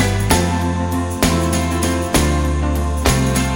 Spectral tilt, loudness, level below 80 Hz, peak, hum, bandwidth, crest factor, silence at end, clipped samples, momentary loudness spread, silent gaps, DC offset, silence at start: -5 dB/octave; -17 LUFS; -22 dBFS; 0 dBFS; none; 18.5 kHz; 16 dB; 0 s; under 0.1%; 4 LU; none; under 0.1%; 0 s